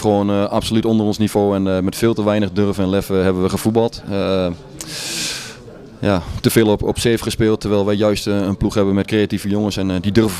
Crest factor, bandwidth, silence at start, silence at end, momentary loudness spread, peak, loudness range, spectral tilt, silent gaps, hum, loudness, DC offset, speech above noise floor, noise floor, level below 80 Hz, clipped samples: 16 dB; 15.5 kHz; 0 s; 0 s; 6 LU; 0 dBFS; 3 LU; -5.5 dB/octave; none; none; -17 LUFS; under 0.1%; 20 dB; -37 dBFS; -38 dBFS; under 0.1%